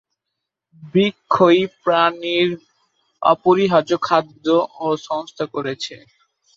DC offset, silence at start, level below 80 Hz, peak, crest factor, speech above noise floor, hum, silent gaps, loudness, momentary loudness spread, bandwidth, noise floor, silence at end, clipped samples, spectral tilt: under 0.1%; 0.8 s; -64 dBFS; -2 dBFS; 18 dB; 63 dB; none; none; -18 LUFS; 12 LU; 7.6 kHz; -81 dBFS; 0.6 s; under 0.1%; -6 dB/octave